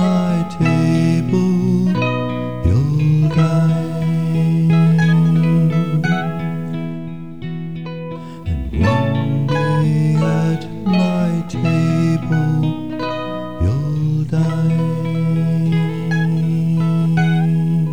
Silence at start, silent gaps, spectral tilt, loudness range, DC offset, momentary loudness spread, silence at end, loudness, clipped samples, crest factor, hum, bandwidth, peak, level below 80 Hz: 0 s; none; -8 dB/octave; 5 LU; 2%; 10 LU; 0 s; -17 LUFS; under 0.1%; 14 dB; none; 9 kHz; -2 dBFS; -36 dBFS